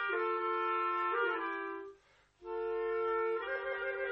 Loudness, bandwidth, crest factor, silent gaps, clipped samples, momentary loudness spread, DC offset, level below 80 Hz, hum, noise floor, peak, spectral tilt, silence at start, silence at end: -35 LUFS; 5.6 kHz; 14 dB; none; under 0.1%; 11 LU; under 0.1%; -72 dBFS; 50 Hz at -75 dBFS; -66 dBFS; -22 dBFS; -5.5 dB/octave; 0 s; 0 s